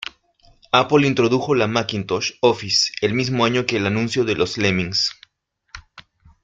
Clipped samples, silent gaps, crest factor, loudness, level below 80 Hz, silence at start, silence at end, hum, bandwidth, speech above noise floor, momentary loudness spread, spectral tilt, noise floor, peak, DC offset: under 0.1%; none; 20 dB; -19 LUFS; -54 dBFS; 0.75 s; 0.65 s; none; 9.4 kHz; 49 dB; 7 LU; -4.5 dB/octave; -68 dBFS; -2 dBFS; under 0.1%